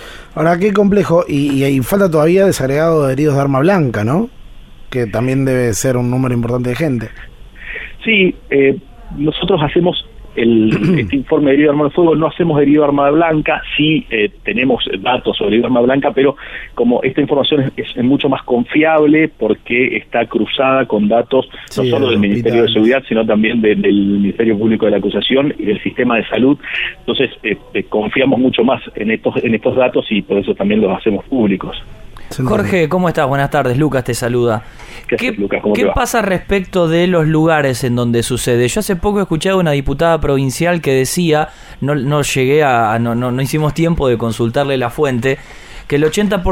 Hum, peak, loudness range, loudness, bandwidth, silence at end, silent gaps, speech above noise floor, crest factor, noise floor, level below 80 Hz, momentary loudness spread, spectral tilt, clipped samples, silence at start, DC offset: none; 0 dBFS; 3 LU; -14 LUFS; 16.5 kHz; 0 s; none; 20 dB; 14 dB; -33 dBFS; -36 dBFS; 7 LU; -6 dB/octave; under 0.1%; 0 s; under 0.1%